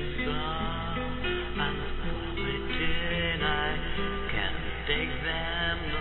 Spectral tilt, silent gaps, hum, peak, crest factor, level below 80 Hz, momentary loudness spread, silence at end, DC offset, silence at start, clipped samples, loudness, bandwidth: -8.5 dB/octave; none; none; -12 dBFS; 16 dB; -36 dBFS; 5 LU; 0 s; under 0.1%; 0 s; under 0.1%; -30 LUFS; 4.3 kHz